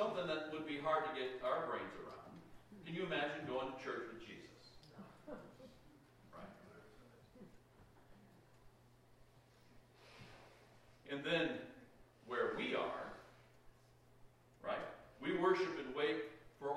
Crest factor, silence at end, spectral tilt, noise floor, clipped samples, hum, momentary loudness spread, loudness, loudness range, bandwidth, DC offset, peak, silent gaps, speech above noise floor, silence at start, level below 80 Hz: 22 dB; 0 s; -5.5 dB/octave; -68 dBFS; under 0.1%; none; 24 LU; -42 LUFS; 22 LU; 13.5 kHz; under 0.1%; -24 dBFS; none; 27 dB; 0 s; -74 dBFS